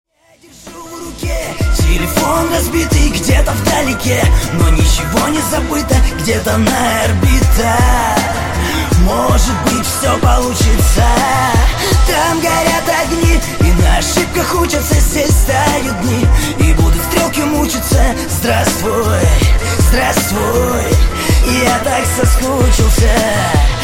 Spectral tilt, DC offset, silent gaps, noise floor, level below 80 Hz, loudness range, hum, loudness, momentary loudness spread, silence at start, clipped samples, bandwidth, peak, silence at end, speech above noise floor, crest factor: -4.5 dB/octave; under 0.1%; none; -45 dBFS; -16 dBFS; 1 LU; none; -13 LUFS; 3 LU; 0.65 s; under 0.1%; 17 kHz; 0 dBFS; 0 s; 34 dB; 10 dB